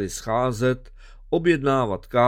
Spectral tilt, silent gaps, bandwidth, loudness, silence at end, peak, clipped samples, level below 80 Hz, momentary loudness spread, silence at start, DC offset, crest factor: -6 dB/octave; none; 16 kHz; -23 LUFS; 0 s; -6 dBFS; under 0.1%; -44 dBFS; 6 LU; 0 s; under 0.1%; 16 dB